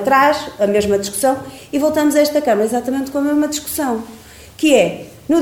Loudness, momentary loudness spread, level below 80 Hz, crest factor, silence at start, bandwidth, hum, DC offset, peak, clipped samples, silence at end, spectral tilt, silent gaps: -16 LUFS; 9 LU; -48 dBFS; 16 dB; 0 s; 18.5 kHz; none; under 0.1%; 0 dBFS; under 0.1%; 0 s; -4 dB/octave; none